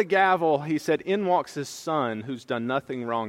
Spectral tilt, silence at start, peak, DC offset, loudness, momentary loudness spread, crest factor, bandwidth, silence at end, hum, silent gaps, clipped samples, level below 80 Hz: -5.5 dB/octave; 0 s; -8 dBFS; under 0.1%; -26 LUFS; 11 LU; 18 dB; 16 kHz; 0 s; none; none; under 0.1%; -72 dBFS